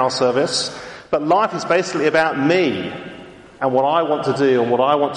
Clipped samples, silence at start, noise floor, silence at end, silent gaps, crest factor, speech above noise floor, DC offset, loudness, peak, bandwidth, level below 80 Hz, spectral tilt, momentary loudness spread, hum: under 0.1%; 0 s; -39 dBFS; 0 s; none; 14 dB; 22 dB; under 0.1%; -18 LUFS; -4 dBFS; 11.5 kHz; -58 dBFS; -4.5 dB/octave; 11 LU; none